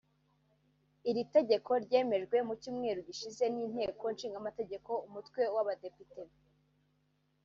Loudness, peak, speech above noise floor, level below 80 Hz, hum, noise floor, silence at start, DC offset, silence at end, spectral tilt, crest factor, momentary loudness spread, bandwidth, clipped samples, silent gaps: -35 LUFS; -16 dBFS; 41 dB; -76 dBFS; 50 Hz at -65 dBFS; -76 dBFS; 1.05 s; under 0.1%; 1.2 s; -3.5 dB/octave; 20 dB; 14 LU; 7.4 kHz; under 0.1%; none